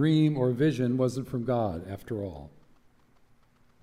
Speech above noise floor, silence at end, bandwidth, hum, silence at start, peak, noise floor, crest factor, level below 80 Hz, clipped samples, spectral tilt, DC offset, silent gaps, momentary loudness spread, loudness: 34 dB; 1.35 s; 14 kHz; none; 0 s; -14 dBFS; -61 dBFS; 16 dB; -58 dBFS; under 0.1%; -8 dB/octave; under 0.1%; none; 14 LU; -28 LUFS